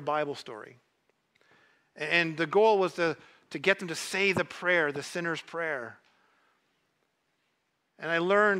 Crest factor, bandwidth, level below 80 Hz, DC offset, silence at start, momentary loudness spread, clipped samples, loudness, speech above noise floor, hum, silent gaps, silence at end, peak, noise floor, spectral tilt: 22 dB; 15.5 kHz; -76 dBFS; under 0.1%; 0 s; 16 LU; under 0.1%; -28 LUFS; 48 dB; none; none; 0 s; -8 dBFS; -77 dBFS; -4 dB/octave